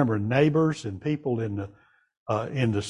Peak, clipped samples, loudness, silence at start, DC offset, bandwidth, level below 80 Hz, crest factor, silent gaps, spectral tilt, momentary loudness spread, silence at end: -8 dBFS; under 0.1%; -26 LUFS; 0 s; under 0.1%; 11 kHz; -54 dBFS; 18 dB; 2.17-2.26 s; -7 dB/octave; 13 LU; 0 s